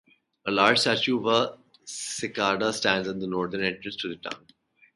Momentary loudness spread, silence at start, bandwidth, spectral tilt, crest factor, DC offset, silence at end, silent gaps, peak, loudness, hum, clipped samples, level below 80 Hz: 16 LU; 0.45 s; 11.5 kHz; -3 dB/octave; 24 dB; under 0.1%; 0.6 s; none; -4 dBFS; -25 LUFS; none; under 0.1%; -64 dBFS